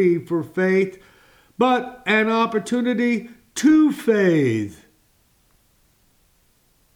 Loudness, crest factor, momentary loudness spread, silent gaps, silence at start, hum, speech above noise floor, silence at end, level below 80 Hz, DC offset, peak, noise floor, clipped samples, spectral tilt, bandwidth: -20 LUFS; 16 dB; 10 LU; none; 0 s; none; 42 dB; 2.2 s; -64 dBFS; under 0.1%; -6 dBFS; -61 dBFS; under 0.1%; -6 dB/octave; 15 kHz